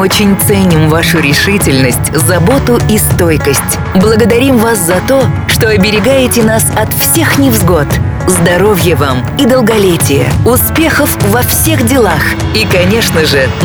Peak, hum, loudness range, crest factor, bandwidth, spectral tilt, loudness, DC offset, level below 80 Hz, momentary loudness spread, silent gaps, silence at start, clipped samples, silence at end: 0 dBFS; none; 0 LU; 8 dB; over 20 kHz; -4.5 dB/octave; -8 LUFS; under 0.1%; -24 dBFS; 3 LU; none; 0 s; under 0.1%; 0 s